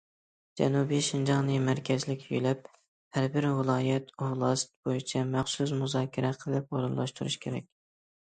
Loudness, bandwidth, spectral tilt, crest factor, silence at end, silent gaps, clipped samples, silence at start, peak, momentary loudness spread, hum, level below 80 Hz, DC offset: -30 LUFS; 9.4 kHz; -5.5 dB/octave; 18 dB; 0.7 s; 2.88-3.11 s, 4.76-4.83 s; under 0.1%; 0.55 s; -12 dBFS; 7 LU; none; -68 dBFS; under 0.1%